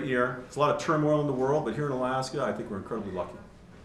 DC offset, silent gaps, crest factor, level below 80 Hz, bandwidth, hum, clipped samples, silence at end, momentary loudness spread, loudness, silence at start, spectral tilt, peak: under 0.1%; none; 16 dB; -58 dBFS; 12.5 kHz; none; under 0.1%; 0 s; 10 LU; -29 LUFS; 0 s; -6.5 dB/octave; -12 dBFS